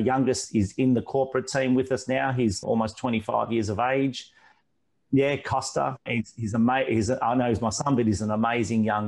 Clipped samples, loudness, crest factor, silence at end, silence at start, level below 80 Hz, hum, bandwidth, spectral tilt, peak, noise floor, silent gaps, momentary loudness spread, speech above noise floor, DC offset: under 0.1%; -25 LUFS; 14 dB; 0 s; 0 s; -54 dBFS; none; 11.5 kHz; -5.5 dB/octave; -12 dBFS; -75 dBFS; none; 5 LU; 51 dB; under 0.1%